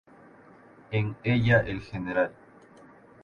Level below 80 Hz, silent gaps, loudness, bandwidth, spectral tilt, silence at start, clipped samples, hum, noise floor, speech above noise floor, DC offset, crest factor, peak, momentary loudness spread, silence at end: -52 dBFS; none; -27 LUFS; 6.8 kHz; -8.5 dB/octave; 0.9 s; under 0.1%; none; -53 dBFS; 27 dB; under 0.1%; 20 dB; -8 dBFS; 11 LU; 0.9 s